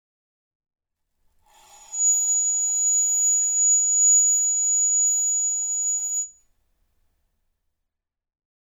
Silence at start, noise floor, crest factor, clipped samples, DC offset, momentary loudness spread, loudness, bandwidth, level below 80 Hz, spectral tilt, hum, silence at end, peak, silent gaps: 1.9 s; -83 dBFS; 12 dB; under 0.1%; under 0.1%; 8 LU; -18 LUFS; over 20 kHz; -70 dBFS; 4.5 dB/octave; none; 2.3 s; -12 dBFS; none